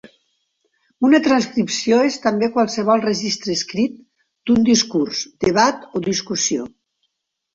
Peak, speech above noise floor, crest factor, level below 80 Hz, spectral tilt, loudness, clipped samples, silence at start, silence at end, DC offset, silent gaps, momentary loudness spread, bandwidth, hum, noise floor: 0 dBFS; 56 dB; 18 dB; -56 dBFS; -3.5 dB/octave; -18 LUFS; under 0.1%; 1 s; 0.85 s; under 0.1%; none; 8 LU; 7.8 kHz; none; -74 dBFS